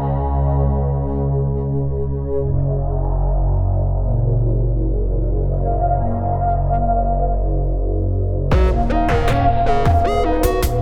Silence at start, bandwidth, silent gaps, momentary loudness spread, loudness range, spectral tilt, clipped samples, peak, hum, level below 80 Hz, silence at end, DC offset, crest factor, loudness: 0 s; 15 kHz; none; 4 LU; 2 LU; -8 dB/octave; under 0.1%; -4 dBFS; none; -20 dBFS; 0 s; under 0.1%; 14 dB; -19 LUFS